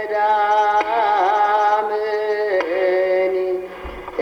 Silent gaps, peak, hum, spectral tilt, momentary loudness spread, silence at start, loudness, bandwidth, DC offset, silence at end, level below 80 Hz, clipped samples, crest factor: none; -6 dBFS; none; -4.5 dB/octave; 9 LU; 0 s; -18 LUFS; 7 kHz; under 0.1%; 0 s; -48 dBFS; under 0.1%; 12 dB